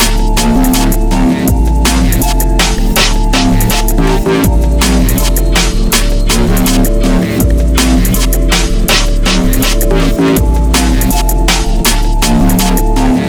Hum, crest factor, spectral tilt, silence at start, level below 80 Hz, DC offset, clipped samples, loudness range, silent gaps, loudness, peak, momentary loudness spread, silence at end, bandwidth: none; 8 dB; -4.5 dB/octave; 0 s; -10 dBFS; under 0.1%; under 0.1%; 0 LU; none; -11 LUFS; 0 dBFS; 2 LU; 0 s; over 20 kHz